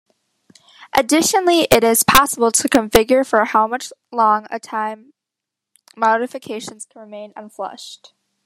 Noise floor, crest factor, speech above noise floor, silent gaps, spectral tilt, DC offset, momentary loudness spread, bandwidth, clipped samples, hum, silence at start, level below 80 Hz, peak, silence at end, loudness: -83 dBFS; 18 dB; 66 dB; none; -2.5 dB/octave; under 0.1%; 22 LU; 14.5 kHz; under 0.1%; none; 0.8 s; -44 dBFS; 0 dBFS; 0.5 s; -16 LUFS